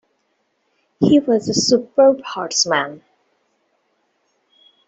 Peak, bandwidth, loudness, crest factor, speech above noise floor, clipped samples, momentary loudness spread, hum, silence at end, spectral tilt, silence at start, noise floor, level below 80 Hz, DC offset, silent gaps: -2 dBFS; 8.2 kHz; -16 LUFS; 18 dB; 52 dB; under 0.1%; 7 LU; none; 1.9 s; -3.5 dB/octave; 1 s; -68 dBFS; -60 dBFS; under 0.1%; none